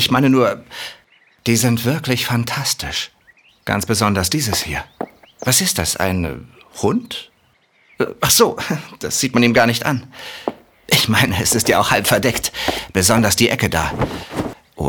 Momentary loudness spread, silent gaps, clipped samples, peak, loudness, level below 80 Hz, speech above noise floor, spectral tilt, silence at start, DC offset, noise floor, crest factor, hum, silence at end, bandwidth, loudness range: 16 LU; none; under 0.1%; -2 dBFS; -17 LUFS; -44 dBFS; 40 dB; -3.5 dB/octave; 0 s; under 0.1%; -58 dBFS; 18 dB; none; 0 s; over 20 kHz; 5 LU